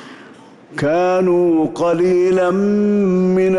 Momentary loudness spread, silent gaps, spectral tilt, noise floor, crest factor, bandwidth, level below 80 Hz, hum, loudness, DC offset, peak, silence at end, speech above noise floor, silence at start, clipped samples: 3 LU; none; -8 dB/octave; -41 dBFS; 8 dB; 11 kHz; -52 dBFS; none; -15 LUFS; under 0.1%; -8 dBFS; 0 s; 27 dB; 0 s; under 0.1%